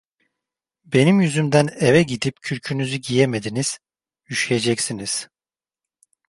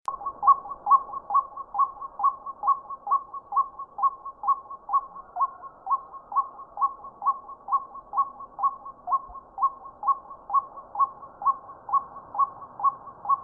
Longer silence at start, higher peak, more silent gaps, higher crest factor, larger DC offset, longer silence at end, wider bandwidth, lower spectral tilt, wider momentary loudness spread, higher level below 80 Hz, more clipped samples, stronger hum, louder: first, 0.9 s vs 0.1 s; first, -2 dBFS vs -8 dBFS; neither; about the same, 20 dB vs 20 dB; neither; first, 1.05 s vs 0 s; first, 11.5 kHz vs 1.7 kHz; second, -5 dB/octave vs -7 dB/octave; about the same, 10 LU vs 8 LU; first, -58 dBFS vs -64 dBFS; neither; neither; first, -20 LUFS vs -27 LUFS